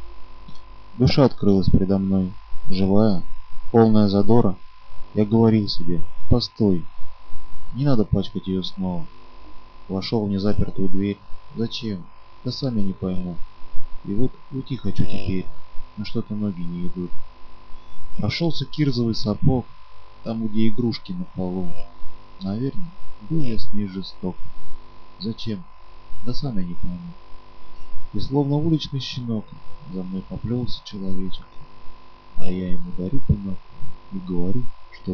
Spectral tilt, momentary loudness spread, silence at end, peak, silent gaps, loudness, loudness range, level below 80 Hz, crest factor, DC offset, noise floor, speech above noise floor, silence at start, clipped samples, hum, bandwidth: -8.5 dB/octave; 21 LU; 0 s; -2 dBFS; none; -24 LUFS; 11 LU; -36 dBFS; 14 dB; under 0.1%; -38 dBFS; 22 dB; 0 s; under 0.1%; none; 6.2 kHz